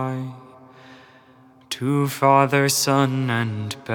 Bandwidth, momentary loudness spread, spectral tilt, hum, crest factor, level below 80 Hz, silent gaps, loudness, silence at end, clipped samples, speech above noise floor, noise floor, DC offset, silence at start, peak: over 20 kHz; 14 LU; -4.5 dB/octave; none; 20 dB; -74 dBFS; none; -20 LUFS; 0 s; under 0.1%; 31 dB; -51 dBFS; under 0.1%; 0 s; -2 dBFS